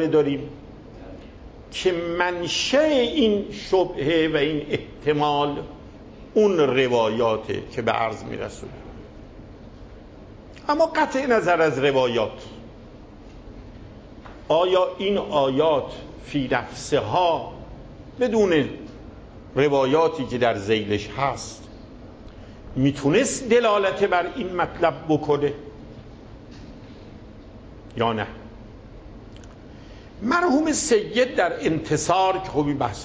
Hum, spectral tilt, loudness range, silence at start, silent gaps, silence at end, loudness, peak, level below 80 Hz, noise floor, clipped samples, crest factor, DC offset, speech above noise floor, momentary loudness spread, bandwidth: none; -5 dB/octave; 8 LU; 0 s; none; 0 s; -22 LUFS; -6 dBFS; -46 dBFS; -43 dBFS; under 0.1%; 18 dB; under 0.1%; 21 dB; 24 LU; 8 kHz